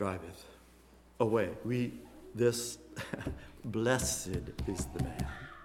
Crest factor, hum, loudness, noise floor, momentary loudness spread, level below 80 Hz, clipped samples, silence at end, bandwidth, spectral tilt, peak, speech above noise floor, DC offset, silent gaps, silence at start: 22 dB; none; -35 LUFS; -60 dBFS; 15 LU; -50 dBFS; under 0.1%; 0 s; 17 kHz; -5 dB/octave; -14 dBFS; 25 dB; under 0.1%; none; 0 s